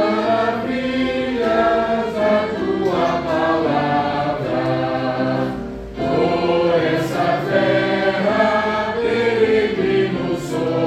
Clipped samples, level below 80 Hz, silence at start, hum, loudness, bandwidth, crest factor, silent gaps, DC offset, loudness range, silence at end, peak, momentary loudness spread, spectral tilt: under 0.1%; -44 dBFS; 0 s; none; -18 LUFS; 14 kHz; 14 dB; none; under 0.1%; 2 LU; 0 s; -4 dBFS; 5 LU; -6.5 dB/octave